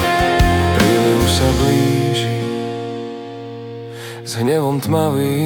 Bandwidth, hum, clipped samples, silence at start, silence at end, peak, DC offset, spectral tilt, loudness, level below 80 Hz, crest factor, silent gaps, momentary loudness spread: 18 kHz; none; under 0.1%; 0 s; 0 s; -2 dBFS; under 0.1%; -5.5 dB/octave; -16 LUFS; -30 dBFS; 14 dB; none; 16 LU